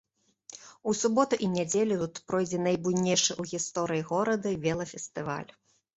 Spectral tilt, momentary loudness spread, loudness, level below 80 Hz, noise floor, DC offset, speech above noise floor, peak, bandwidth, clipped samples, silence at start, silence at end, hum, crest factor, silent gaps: -4 dB/octave; 11 LU; -29 LUFS; -64 dBFS; -55 dBFS; under 0.1%; 26 dB; -10 dBFS; 8.2 kHz; under 0.1%; 0.5 s; 0.5 s; none; 20 dB; none